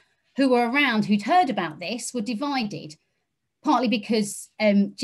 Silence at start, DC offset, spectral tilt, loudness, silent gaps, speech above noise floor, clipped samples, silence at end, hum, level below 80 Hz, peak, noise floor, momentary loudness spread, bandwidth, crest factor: 0.35 s; under 0.1%; -4.5 dB/octave; -23 LUFS; none; 55 dB; under 0.1%; 0 s; none; -72 dBFS; -8 dBFS; -78 dBFS; 11 LU; 12.5 kHz; 16 dB